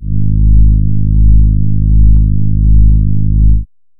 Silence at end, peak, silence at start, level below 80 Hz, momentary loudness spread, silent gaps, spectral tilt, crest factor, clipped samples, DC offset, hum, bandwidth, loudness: 0.35 s; 0 dBFS; 0 s; -10 dBFS; 4 LU; none; -17.5 dB/octave; 6 dB; 0.3%; under 0.1%; none; 0.5 kHz; -11 LUFS